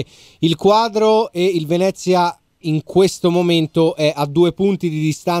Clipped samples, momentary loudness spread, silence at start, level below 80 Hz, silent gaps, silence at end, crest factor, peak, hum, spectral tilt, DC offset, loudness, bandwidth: under 0.1%; 7 LU; 0 s; -54 dBFS; none; 0 s; 14 dB; -2 dBFS; none; -6 dB/octave; under 0.1%; -16 LUFS; 15.5 kHz